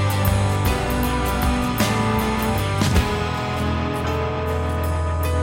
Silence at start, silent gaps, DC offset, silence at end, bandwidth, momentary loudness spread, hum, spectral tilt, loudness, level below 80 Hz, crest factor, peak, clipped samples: 0 s; none; under 0.1%; 0 s; 17 kHz; 4 LU; none; -5.5 dB/octave; -21 LUFS; -28 dBFS; 16 dB; -4 dBFS; under 0.1%